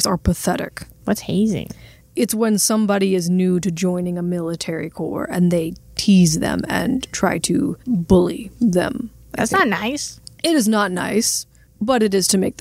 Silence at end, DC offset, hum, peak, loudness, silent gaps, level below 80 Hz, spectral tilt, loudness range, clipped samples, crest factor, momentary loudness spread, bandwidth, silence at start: 0.1 s; under 0.1%; none; -2 dBFS; -19 LUFS; none; -40 dBFS; -4.5 dB/octave; 2 LU; under 0.1%; 18 dB; 10 LU; 16 kHz; 0 s